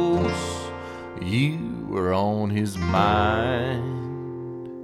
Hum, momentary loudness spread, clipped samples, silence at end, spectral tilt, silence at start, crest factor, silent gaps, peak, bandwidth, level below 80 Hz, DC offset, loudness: none; 14 LU; under 0.1%; 0 s; -6.5 dB/octave; 0 s; 18 dB; none; -6 dBFS; 13.5 kHz; -44 dBFS; under 0.1%; -25 LUFS